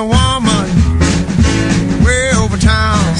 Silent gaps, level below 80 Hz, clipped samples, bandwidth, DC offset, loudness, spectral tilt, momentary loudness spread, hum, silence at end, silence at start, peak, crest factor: none; -20 dBFS; under 0.1%; 11 kHz; under 0.1%; -12 LUFS; -5 dB/octave; 2 LU; none; 0 s; 0 s; 0 dBFS; 12 dB